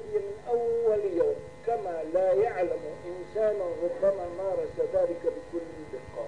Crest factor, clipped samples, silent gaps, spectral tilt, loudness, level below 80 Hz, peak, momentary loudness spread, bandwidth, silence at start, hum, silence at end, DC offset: 14 dB; under 0.1%; none; -7 dB/octave; -29 LUFS; -58 dBFS; -14 dBFS; 12 LU; 10.5 kHz; 0 s; none; 0 s; 0.3%